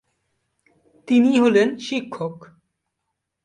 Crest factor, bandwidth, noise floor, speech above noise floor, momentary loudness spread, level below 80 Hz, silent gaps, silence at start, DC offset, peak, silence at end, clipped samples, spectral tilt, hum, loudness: 16 dB; 9.4 kHz; -79 dBFS; 60 dB; 15 LU; -68 dBFS; none; 1.1 s; under 0.1%; -6 dBFS; 1 s; under 0.1%; -5.5 dB/octave; none; -19 LUFS